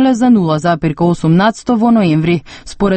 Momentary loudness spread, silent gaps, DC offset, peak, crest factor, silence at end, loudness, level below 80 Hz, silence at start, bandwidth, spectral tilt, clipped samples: 6 LU; none; under 0.1%; 0 dBFS; 12 dB; 0 s; -12 LUFS; -38 dBFS; 0 s; 8.8 kHz; -7 dB/octave; under 0.1%